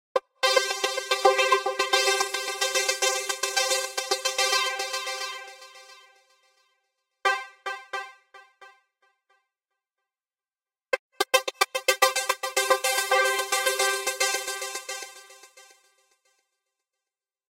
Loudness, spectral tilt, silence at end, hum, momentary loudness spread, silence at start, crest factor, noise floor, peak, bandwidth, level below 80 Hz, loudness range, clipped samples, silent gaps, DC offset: -25 LUFS; 2 dB/octave; 1.9 s; none; 13 LU; 0.15 s; 26 dB; under -90 dBFS; -2 dBFS; 16.5 kHz; -76 dBFS; 11 LU; under 0.1%; 10.99-11.10 s; under 0.1%